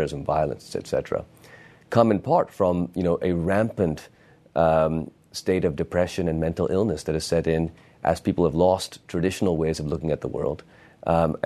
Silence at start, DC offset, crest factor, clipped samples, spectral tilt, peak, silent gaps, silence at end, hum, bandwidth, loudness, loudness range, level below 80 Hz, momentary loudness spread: 0 s; under 0.1%; 22 dB; under 0.1%; -6.5 dB/octave; -2 dBFS; none; 0.1 s; none; 13.5 kHz; -24 LUFS; 1 LU; -46 dBFS; 10 LU